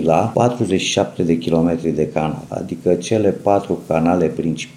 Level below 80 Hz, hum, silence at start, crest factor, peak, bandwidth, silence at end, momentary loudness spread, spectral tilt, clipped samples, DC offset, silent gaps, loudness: -46 dBFS; none; 0 s; 16 dB; 0 dBFS; 13 kHz; 0.05 s; 6 LU; -6 dB/octave; under 0.1%; under 0.1%; none; -18 LUFS